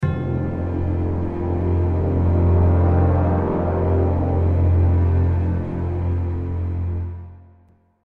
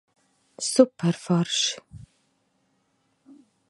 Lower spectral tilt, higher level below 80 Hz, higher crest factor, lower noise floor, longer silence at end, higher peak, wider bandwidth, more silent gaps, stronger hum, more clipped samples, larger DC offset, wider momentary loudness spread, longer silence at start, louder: first, -11.5 dB/octave vs -4.5 dB/octave; first, -30 dBFS vs -64 dBFS; second, 14 dB vs 24 dB; second, -55 dBFS vs -70 dBFS; second, 0.65 s vs 1.65 s; second, -6 dBFS vs -2 dBFS; second, 2.7 kHz vs 11.5 kHz; neither; neither; neither; neither; about the same, 8 LU vs 9 LU; second, 0 s vs 0.6 s; first, -20 LUFS vs -23 LUFS